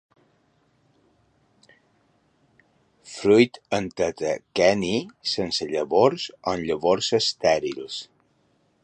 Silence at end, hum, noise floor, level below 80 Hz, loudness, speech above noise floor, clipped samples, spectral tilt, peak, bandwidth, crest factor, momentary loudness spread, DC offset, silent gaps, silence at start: 0.8 s; none; -66 dBFS; -58 dBFS; -23 LUFS; 43 dB; under 0.1%; -4.5 dB/octave; -4 dBFS; 10 kHz; 22 dB; 11 LU; under 0.1%; none; 3.05 s